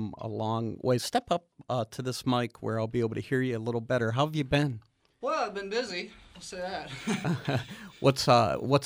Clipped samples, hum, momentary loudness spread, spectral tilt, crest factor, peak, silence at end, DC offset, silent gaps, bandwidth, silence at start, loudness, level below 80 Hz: under 0.1%; none; 10 LU; -5.5 dB/octave; 20 dB; -8 dBFS; 0 s; under 0.1%; none; 15.5 kHz; 0 s; -30 LUFS; -60 dBFS